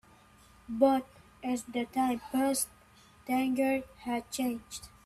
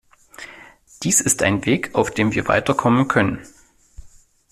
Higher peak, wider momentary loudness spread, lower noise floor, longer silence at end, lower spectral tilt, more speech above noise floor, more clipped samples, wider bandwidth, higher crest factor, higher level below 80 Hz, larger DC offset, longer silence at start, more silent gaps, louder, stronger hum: second, -12 dBFS vs -4 dBFS; second, 14 LU vs 21 LU; first, -59 dBFS vs -47 dBFS; second, 0.15 s vs 0.45 s; about the same, -3.5 dB/octave vs -4 dB/octave; about the same, 28 dB vs 29 dB; neither; about the same, 15.5 kHz vs 15 kHz; about the same, 20 dB vs 18 dB; second, -64 dBFS vs -48 dBFS; neither; first, 0.7 s vs 0.4 s; neither; second, -32 LUFS vs -18 LUFS; neither